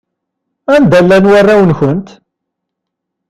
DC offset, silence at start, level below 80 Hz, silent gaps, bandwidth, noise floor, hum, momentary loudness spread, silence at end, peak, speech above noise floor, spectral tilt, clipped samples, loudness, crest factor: under 0.1%; 0.7 s; -42 dBFS; none; 12.5 kHz; -75 dBFS; none; 10 LU; 1.25 s; 0 dBFS; 68 dB; -7.5 dB/octave; under 0.1%; -7 LUFS; 10 dB